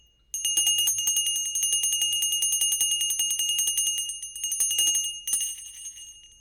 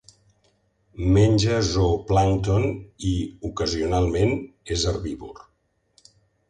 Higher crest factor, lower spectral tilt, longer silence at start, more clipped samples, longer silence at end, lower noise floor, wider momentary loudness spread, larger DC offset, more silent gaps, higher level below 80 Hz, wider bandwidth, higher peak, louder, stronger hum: about the same, 14 dB vs 18 dB; second, 4.5 dB/octave vs -6 dB/octave; second, 0.35 s vs 0.95 s; neither; second, 0.15 s vs 1.1 s; second, -46 dBFS vs -69 dBFS; about the same, 11 LU vs 11 LU; neither; neither; second, -64 dBFS vs -36 dBFS; first, 18 kHz vs 9.8 kHz; second, -12 dBFS vs -6 dBFS; about the same, -23 LUFS vs -23 LUFS; neither